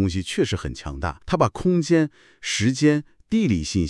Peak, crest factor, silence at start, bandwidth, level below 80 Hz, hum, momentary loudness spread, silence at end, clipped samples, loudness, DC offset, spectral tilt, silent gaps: -4 dBFS; 18 dB; 0 s; 12 kHz; -42 dBFS; none; 10 LU; 0 s; under 0.1%; -23 LUFS; under 0.1%; -5.5 dB/octave; none